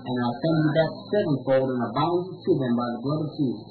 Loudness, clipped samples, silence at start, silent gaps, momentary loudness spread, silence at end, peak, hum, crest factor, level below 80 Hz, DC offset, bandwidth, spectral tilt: -25 LUFS; under 0.1%; 0 s; none; 5 LU; 0 s; -10 dBFS; none; 14 dB; -62 dBFS; under 0.1%; 4.6 kHz; -11 dB/octave